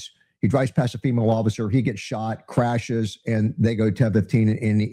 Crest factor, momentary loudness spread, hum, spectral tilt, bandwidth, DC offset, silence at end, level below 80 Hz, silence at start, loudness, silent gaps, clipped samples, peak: 16 dB; 6 LU; none; -7.5 dB/octave; 11 kHz; under 0.1%; 0 s; -54 dBFS; 0 s; -22 LUFS; none; under 0.1%; -6 dBFS